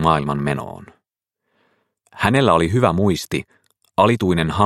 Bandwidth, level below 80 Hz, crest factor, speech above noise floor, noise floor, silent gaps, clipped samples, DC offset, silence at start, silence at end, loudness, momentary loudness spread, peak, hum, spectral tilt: 16 kHz; -44 dBFS; 20 dB; 61 dB; -78 dBFS; none; under 0.1%; under 0.1%; 0 s; 0 s; -18 LUFS; 11 LU; 0 dBFS; none; -6.5 dB/octave